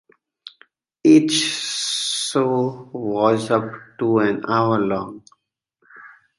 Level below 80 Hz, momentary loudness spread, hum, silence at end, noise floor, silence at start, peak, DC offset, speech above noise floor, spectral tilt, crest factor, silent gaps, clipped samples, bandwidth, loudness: -62 dBFS; 12 LU; none; 0.3 s; -70 dBFS; 0.45 s; -2 dBFS; under 0.1%; 50 dB; -4 dB/octave; 18 dB; none; under 0.1%; 11.5 kHz; -19 LUFS